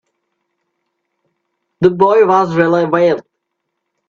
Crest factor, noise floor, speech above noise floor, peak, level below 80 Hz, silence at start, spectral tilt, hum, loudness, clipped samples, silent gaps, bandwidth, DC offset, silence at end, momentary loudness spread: 16 dB; -74 dBFS; 62 dB; 0 dBFS; -58 dBFS; 1.8 s; -7.5 dB/octave; none; -12 LUFS; under 0.1%; none; 7.2 kHz; under 0.1%; 0.9 s; 5 LU